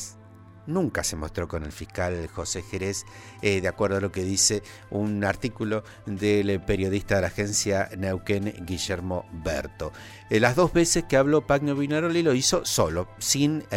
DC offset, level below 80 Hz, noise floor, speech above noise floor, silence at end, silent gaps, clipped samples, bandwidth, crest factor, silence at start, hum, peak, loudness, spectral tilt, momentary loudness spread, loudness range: under 0.1%; -46 dBFS; -48 dBFS; 23 dB; 0 s; none; under 0.1%; 16 kHz; 20 dB; 0 s; none; -4 dBFS; -25 LUFS; -4 dB/octave; 11 LU; 6 LU